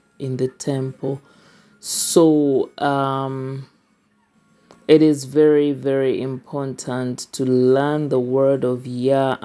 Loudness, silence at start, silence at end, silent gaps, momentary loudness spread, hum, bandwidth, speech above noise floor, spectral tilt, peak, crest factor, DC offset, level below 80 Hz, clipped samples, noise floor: -19 LUFS; 0.2 s; 0.05 s; none; 14 LU; none; 11 kHz; 43 dB; -5.5 dB/octave; 0 dBFS; 18 dB; under 0.1%; -70 dBFS; under 0.1%; -62 dBFS